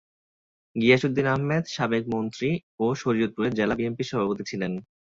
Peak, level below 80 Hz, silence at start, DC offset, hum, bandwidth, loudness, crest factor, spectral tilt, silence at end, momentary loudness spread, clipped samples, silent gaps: -6 dBFS; -60 dBFS; 0.75 s; under 0.1%; none; 7.8 kHz; -25 LUFS; 20 dB; -6.5 dB/octave; 0.3 s; 9 LU; under 0.1%; 2.63-2.78 s